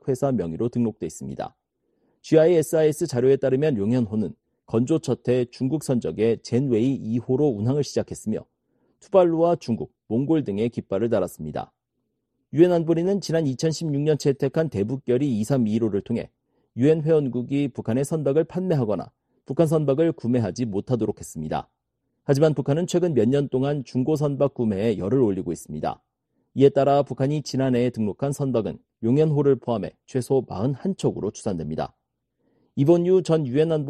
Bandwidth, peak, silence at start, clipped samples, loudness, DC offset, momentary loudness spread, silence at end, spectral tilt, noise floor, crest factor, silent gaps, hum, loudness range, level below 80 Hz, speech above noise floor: 13 kHz; -4 dBFS; 0.05 s; under 0.1%; -23 LUFS; under 0.1%; 11 LU; 0 s; -7.5 dB/octave; -77 dBFS; 18 dB; none; none; 2 LU; -56 dBFS; 55 dB